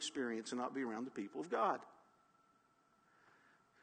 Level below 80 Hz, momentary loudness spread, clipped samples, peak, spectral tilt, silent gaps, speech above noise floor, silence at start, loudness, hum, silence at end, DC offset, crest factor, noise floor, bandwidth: under -90 dBFS; 9 LU; under 0.1%; -22 dBFS; -3.5 dB/octave; none; 33 dB; 0 s; -42 LUFS; none; 1.9 s; under 0.1%; 22 dB; -75 dBFS; 9 kHz